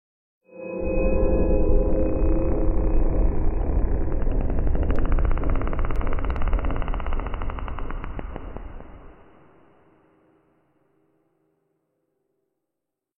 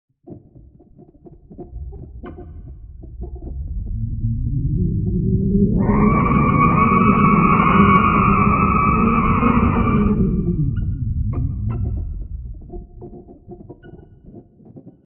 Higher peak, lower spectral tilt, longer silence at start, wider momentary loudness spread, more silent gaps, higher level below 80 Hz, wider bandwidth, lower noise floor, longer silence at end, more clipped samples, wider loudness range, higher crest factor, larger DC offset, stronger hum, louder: second, -8 dBFS vs -2 dBFS; first, -11 dB/octave vs -8 dB/octave; first, 0.55 s vs 0.3 s; second, 14 LU vs 23 LU; neither; about the same, -24 dBFS vs -28 dBFS; about the same, 3.1 kHz vs 3.2 kHz; first, -84 dBFS vs -47 dBFS; first, 4.05 s vs 0.15 s; neither; about the same, 16 LU vs 18 LU; about the same, 16 dB vs 18 dB; neither; neither; second, -27 LUFS vs -17 LUFS